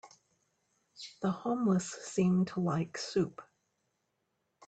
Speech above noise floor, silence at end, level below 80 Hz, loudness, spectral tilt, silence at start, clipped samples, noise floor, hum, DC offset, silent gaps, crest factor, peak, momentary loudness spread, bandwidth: 50 dB; 1.25 s; -72 dBFS; -33 LUFS; -6.5 dB/octave; 0.05 s; under 0.1%; -81 dBFS; none; under 0.1%; none; 16 dB; -18 dBFS; 13 LU; 9 kHz